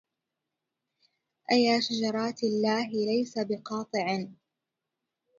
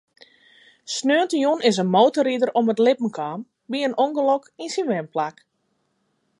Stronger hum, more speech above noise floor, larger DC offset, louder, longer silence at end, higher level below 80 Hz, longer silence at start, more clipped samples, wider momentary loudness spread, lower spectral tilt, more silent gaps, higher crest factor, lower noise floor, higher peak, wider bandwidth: neither; first, 59 dB vs 50 dB; neither; second, -28 LUFS vs -21 LUFS; about the same, 1.05 s vs 1.1 s; about the same, -78 dBFS vs -76 dBFS; first, 1.5 s vs 0.85 s; neither; second, 9 LU vs 12 LU; about the same, -4.5 dB/octave vs -4.5 dB/octave; neither; about the same, 20 dB vs 18 dB; first, -86 dBFS vs -71 dBFS; second, -12 dBFS vs -4 dBFS; second, 7.6 kHz vs 11.5 kHz